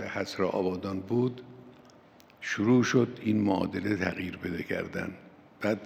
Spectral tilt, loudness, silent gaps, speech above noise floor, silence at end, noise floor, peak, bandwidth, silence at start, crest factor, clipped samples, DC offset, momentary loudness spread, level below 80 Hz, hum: -6 dB/octave; -30 LUFS; none; 28 dB; 0 s; -56 dBFS; -12 dBFS; 15 kHz; 0 s; 18 dB; under 0.1%; under 0.1%; 13 LU; -70 dBFS; none